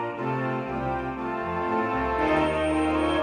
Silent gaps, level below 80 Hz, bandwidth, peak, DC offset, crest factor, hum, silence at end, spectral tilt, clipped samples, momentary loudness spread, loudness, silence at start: none; -44 dBFS; 9.4 kHz; -12 dBFS; under 0.1%; 14 dB; none; 0 s; -6.5 dB/octave; under 0.1%; 6 LU; -26 LUFS; 0 s